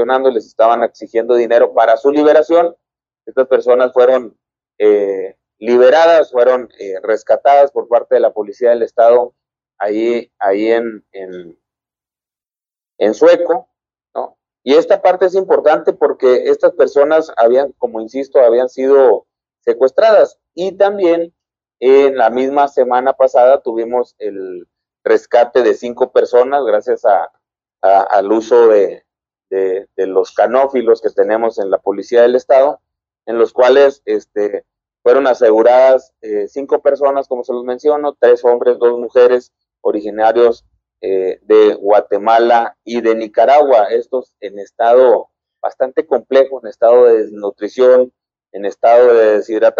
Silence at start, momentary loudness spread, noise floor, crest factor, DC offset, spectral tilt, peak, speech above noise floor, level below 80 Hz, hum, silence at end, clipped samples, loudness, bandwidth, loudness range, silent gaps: 0 s; 13 LU; under -90 dBFS; 12 dB; under 0.1%; -5 dB/octave; 0 dBFS; over 79 dB; -64 dBFS; none; 0 s; under 0.1%; -12 LUFS; 7.2 kHz; 3 LU; none